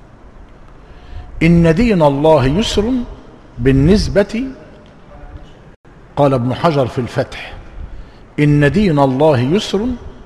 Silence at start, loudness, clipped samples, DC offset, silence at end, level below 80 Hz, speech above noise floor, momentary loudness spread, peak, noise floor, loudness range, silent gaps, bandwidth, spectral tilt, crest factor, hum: 0.35 s; -14 LUFS; under 0.1%; 0.3%; 0.1 s; -30 dBFS; 26 dB; 19 LU; 0 dBFS; -39 dBFS; 6 LU; 5.76-5.84 s; 12 kHz; -7 dB/octave; 16 dB; none